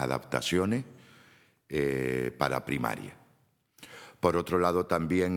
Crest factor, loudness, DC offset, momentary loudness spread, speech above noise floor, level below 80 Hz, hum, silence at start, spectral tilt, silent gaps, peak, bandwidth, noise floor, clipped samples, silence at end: 22 dB; -30 LUFS; under 0.1%; 20 LU; 39 dB; -58 dBFS; none; 0 s; -5.5 dB/octave; none; -8 dBFS; 19 kHz; -68 dBFS; under 0.1%; 0 s